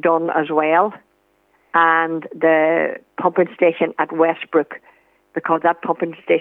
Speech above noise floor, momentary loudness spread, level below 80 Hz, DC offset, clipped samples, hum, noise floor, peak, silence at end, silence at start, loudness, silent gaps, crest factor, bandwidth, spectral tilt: 43 dB; 8 LU; -76 dBFS; under 0.1%; under 0.1%; none; -61 dBFS; -2 dBFS; 0 s; 0.05 s; -18 LUFS; none; 18 dB; 3.9 kHz; -8 dB/octave